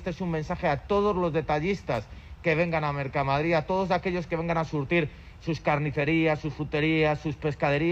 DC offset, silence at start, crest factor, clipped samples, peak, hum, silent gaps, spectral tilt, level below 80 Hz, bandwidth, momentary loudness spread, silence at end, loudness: under 0.1%; 0 s; 16 dB; under 0.1%; -12 dBFS; none; none; -7.5 dB/octave; -46 dBFS; 8 kHz; 7 LU; 0 s; -27 LUFS